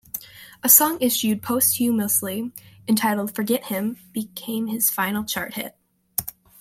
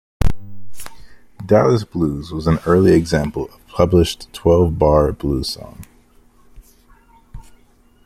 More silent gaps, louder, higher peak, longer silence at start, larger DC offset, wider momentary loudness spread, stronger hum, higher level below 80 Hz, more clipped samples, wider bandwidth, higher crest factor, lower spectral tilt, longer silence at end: neither; second, -21 LUFS vs -17 LUFS; about the same, 0 dBFS vs 0 dBFS; about the same, 0.15 s vs 0.2 s; neither; second, 19 LU vs 22 LU; neither; second, -62 dBFS vs -32 dBFS; neither; about the same, 16.5 kHz vs 16.5 kHz; first, 24 dB vs 18 dB; second, -3 dB/octave vs -7 dB/octave; second, 0.3 s vs 0.65 s